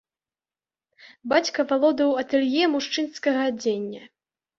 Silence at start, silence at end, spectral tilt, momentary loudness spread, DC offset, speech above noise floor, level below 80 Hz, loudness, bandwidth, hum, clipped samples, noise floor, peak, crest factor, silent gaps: 1.05 s; 0.55 s; -3.5 dB/octave; 10 LU; under 0.1%; over 67 dB; -70 dBFS; -23 LUFS; 7.6 kHz; none; under 0.1%; under -90 dBFS; -6 dBFS; 20 dB; none